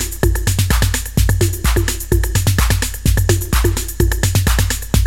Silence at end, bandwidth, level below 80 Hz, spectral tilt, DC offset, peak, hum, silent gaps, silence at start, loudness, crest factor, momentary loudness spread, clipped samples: 0 s; 17 kHz; -18 dBFS; -4.5 dB/octave; under 0.1%; 0 dBFS; none; none; 0 s; -16 LUFS; 14 dB; 3 LU; under 0.1%